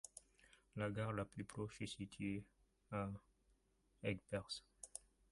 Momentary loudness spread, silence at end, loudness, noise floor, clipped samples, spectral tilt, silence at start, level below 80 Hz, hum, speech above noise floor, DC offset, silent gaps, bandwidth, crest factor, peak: 12 LU; 0.3 s; -48 LUFS; -79 dBFS; under 0.1%; -5.5 dB/octave; 0.05 s; -70 dBFS; none; 33 dB; under 0.1%; none; 11.5 kHz; 22 dB; -28 dBFS